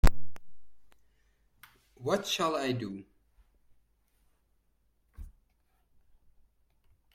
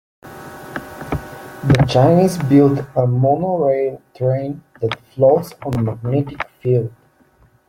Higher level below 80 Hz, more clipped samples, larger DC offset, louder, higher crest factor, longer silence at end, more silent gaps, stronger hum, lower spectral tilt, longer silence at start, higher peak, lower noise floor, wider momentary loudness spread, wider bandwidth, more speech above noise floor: about the same, -40 dBFS vs -44 dBFS; neither; neither; second, -32 LUFS vs -17 LUFS; first, 22 dB vs 16 dB; first, 1.85 s vs 0.8 s; neither; neither; second, -5 dB/octave vs -8 dB/octave; second, 0.05 s vs 0.25 s; second, -10 dBFS vs -2 dBFS; first, -72 dBFS vs -54 dBFS; first, 24 LU vs 17 LU; about the same, 16.5 kHz vs 16 kHz; about the same, 40 dB vs 38 dB